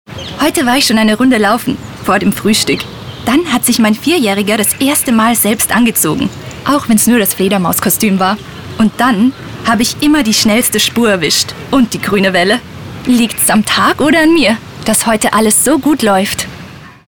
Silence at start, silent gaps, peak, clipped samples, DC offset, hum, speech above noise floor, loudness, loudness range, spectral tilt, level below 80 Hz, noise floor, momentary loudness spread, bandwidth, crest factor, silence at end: 0.1 s; none; 0 dBFS; under 0.1%; under 0.1%; none; 21 dB; -11 LUFS; 2 LU; -3.5 dB/octave; -40 dBFS; -32 dBFS; 8 LU; over 20 kHz; 12 dB; 0.2 s